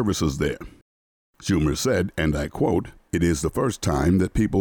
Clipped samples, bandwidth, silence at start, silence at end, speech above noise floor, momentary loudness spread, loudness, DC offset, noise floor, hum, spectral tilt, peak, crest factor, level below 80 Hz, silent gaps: under 0.1%; over 20 kHz; 0 s; 0 s; over 68 dB; 6 LU; -23 LUFS; under 0.1%; under -90 dBFS; none; -6 dB/octave; -10 dBFS; 12 dB; -36 dBFS; 0.82-1.34 s